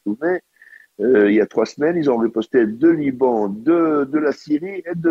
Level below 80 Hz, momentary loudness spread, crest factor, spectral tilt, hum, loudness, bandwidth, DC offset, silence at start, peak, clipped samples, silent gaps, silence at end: -60 dBFS; 8 LU; 14 dB; -7.5 dB/octave; none; -18 LUFS; 7.2 kHz; under 0.1%; 0.05 s; -4 dBFS; under 0.1%; none; 0 s